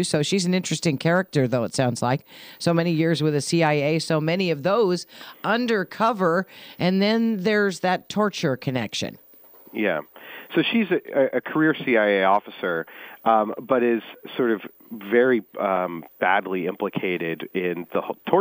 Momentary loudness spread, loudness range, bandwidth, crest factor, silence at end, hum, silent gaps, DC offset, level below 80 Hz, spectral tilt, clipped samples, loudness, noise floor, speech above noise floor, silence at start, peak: 8 LU; 3 LU; 16 kHz; 20 dB; 0 s; none; none; under 0.1%; -68 dBFS; -5.5 dB/octave; under 0.1%; -23 LUFS; -49 dBFS; 27 dB; 0 s; -2 dBFS